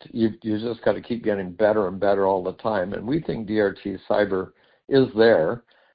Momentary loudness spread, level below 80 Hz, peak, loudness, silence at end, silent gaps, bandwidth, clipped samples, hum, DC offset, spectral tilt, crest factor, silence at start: 9 LU; -54 dBFS; -6 dBFS; -23 LUFS; 0.35 s; none; 5.2 kHz; under 0.1%; none; under 0.1%; -11 dB/octave; 18 dB; 0.15 s